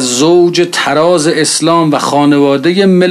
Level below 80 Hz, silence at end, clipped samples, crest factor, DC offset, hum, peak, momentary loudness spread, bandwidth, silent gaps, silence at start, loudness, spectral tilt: -56 dBFS; 0 s; under 0.1%; 8 dB; under 0.1%; none; 0 dBFS; 2 LU; 13.5 kHz; none; 0 s; -9 LUFS; -4.5 dB/octave